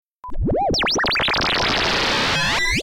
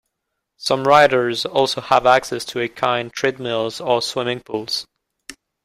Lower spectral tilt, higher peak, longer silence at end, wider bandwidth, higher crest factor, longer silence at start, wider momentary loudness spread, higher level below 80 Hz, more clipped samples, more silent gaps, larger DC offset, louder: about the same, -3 dB/octave vs -3.5 dB/octave; second, -12 dBFS vs 0 dBFS; second, 0 s vs 0.3 s; about the same, 17.5 kHz vs 16 kHz; second, 8 dB vs 18 dB; second, 0.25 s vs 0.6 s; second, 5 LU vs 12 LU; first, -32 dBFS vs -58 dBFS; neither; neither; neither; about the same, -18 LUFS vs -19 LUFS